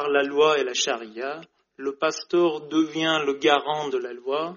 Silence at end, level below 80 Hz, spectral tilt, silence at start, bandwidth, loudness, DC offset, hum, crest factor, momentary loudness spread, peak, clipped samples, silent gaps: 0 s; -76 dBFS; -1.5 dB/octave; 0 s; 7.2 kHz; -24 LUFS; under 0.1%; none; 20 dB; 13 LU; -4 dBFS; under 0.1%; none